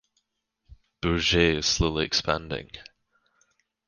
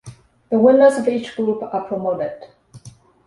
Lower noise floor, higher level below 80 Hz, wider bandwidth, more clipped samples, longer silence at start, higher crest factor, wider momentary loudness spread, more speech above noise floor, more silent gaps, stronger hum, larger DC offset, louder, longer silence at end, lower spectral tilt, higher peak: first, -78 dBFS vs -44 dBFS; first, -42 dBFS vs -62 dBFS; about the same, 10.5 kHz vs 11.5 kHz; neither; first, 0.7 s vs 0.05 s; first, 22 dB vs 16 dB; about the same, 14 LU vs 13 LU; first, 53 dB vs 27 dB; neither; neither; neither; second, -24 LUFS vs -18 LUFS; first, 1.05 s vs 0.4 s; second, -3.5 dB/octave vs -6.5 dB/octave; second, -6 dBFS vs -2 dBFS